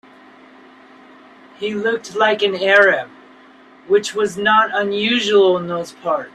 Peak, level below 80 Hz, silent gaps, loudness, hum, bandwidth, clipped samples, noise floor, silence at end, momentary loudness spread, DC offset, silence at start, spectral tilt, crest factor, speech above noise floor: -2 dBFS; -66 dBFS; none; -16 LUFS; none; 12 kHz; under 0.1%; -46 dBFS; 0.05 s; 12 LU; under 0.1%; 1.6 s; -3.5 dB/octave; 18 dB; 29 dB